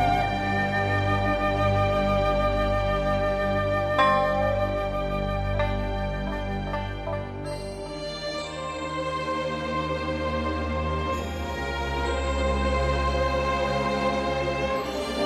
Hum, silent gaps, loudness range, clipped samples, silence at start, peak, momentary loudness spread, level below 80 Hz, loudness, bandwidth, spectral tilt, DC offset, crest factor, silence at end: none; none; 7 LU; under 0.1%; 0 s; -8 dBFS; 8 LU; -34 dBFS; -26 LUFS; 13 kHz; -6 dB/octave; under 0.1%; 18 dB; 0 s